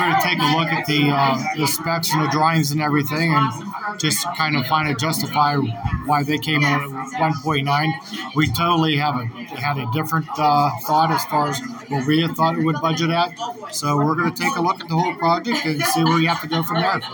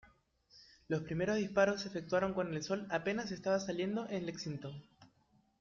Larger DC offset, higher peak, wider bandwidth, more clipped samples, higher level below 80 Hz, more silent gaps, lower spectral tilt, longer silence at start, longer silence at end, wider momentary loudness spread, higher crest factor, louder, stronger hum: neither; first, -4 dBFS vs -18 dBFS; first, 19.5 kHz vs 7.4 kHz; neither; first, -48 dBFS vs -68 dBFS; neither; about the same, -4.5 dB/octave vs -5 dB/octave; about the same, 0 s vs 0.05 s; second, 0 s vs 0.55 s; second, 7 LU vs 10 LU; about the same, 16 dB vs 20 dB; first, -20 LUFS vs -37 LUFS; neither